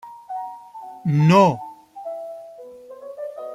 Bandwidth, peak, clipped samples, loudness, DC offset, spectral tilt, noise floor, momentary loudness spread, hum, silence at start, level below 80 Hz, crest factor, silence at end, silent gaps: 12 kHz; -2 dBFS; under 0.1%; -19 LUFS; under 0.1%; -7.5 dB/octave; -41 dBFS; 25 LU; none; 0.05 s; -64 dBFS; 20 dB; 0 s; none